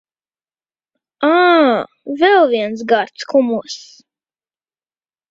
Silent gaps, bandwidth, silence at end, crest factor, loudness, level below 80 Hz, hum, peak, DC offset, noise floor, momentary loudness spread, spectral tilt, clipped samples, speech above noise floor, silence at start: none; 7.8 kHz; 1.5 s; 16 dB; -14 LUFS; -66 dBFS; none; -2 dBFS; under 0.1%; under -90 dBFS; 13 LU; -4 dB/octave; under 0.1%; over 75 dB; 1.2 s